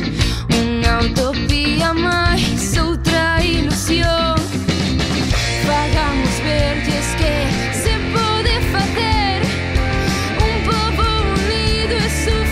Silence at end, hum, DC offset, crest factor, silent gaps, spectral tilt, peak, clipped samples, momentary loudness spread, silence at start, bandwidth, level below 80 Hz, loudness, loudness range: 0 s; none; under 0.1%; 14 dB; none; -4.5 dB/octave; -2 dBFS; under 0.1%; 3 LU; 0 s; 16 kHz; -22 dBFS; -17 LUFS; 1 LU